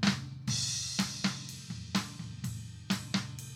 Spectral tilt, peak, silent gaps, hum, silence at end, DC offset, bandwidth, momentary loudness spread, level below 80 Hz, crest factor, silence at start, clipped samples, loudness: -3.5 dB/octave; -14 dBFS; none; none; 0 s; under 0.1%; 17 kHz; 11 LU; -64 dBFS; 22 dB; 0 s; under 0.1%; -35 LUFS